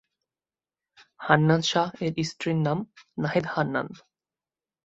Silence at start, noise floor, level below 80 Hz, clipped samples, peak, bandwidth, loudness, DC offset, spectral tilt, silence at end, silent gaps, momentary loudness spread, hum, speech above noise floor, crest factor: 1.2 s; under -90 dBFS; -64 dBFS; under 0.1%; -4 dBFS; 8 kHz; -26 LUFS; under 0.1%; -5.5 dB/octave; 0.9 s; none; 12 LU; none; over 65 dB; 24 dB